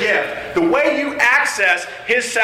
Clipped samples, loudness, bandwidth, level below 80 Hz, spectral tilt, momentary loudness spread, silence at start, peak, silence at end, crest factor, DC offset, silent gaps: under 0.1%; -16 LUFS; 16 kHz; -52 dBFS; -2.5 dB/octave; 6 LU; 0 s; -2 dBFS; 0 s; 14 dB; under 0.1%; none